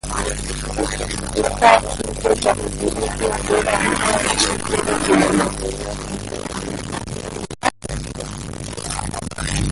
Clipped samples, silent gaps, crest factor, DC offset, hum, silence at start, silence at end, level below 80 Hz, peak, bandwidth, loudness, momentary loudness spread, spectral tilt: under 0.1%; none; 20 dB; under 0.1%; none; 0.05 s; 0 s; -32 dBFS; 0 dBFS; 12 kHz; -20 LUFS; 13 LU; -3.5 dB/octave